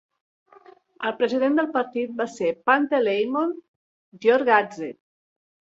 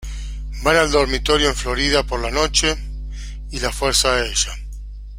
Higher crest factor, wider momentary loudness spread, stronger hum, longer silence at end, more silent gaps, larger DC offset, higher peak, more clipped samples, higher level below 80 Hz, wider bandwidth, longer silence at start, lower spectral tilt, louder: about the same, 20 dB vs 20 dB; second, 11 LU vs 17 LU; second, none vs 50 Hz at -25 dBFS; first, 0.7 s vs 0 s; first, 3.68-4.12 s vs none; neither; second, -4 dBFS vs 0 dBFS; neither; second, -74 dBFS vs -28 dBFS; second, 7.8 kHz vs 16.5 kHz; first, 1 s vs 0 s; first, -5 dB/octave vs -2.5 dB/octave; second, -23 LUFS vs -18 LUFS